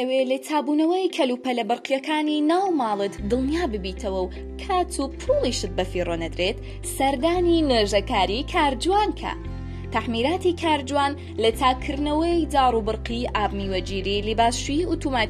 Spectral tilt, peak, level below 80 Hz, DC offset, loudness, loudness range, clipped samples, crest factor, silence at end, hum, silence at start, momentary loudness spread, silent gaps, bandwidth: -5 dB/octave; -6 dBFS; -36 dBFS; under 0.1%; -23 LUFS; 3 LU; under 0.1%; 18 dB; 0 s; none; 0 s; 7 LU; none; 14 kHz